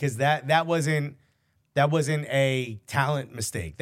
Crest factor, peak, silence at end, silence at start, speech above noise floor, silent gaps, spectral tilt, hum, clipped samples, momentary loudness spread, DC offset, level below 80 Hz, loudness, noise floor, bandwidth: 18 dB; -8 dBFS; 0.05 s; 0 s; 44 dB; none; -5 dB/octave; none; under 0.1%; 8 LU; under 0.1%; -56 dBFS; -25 LUFS; -69 dBFS; 16 kHz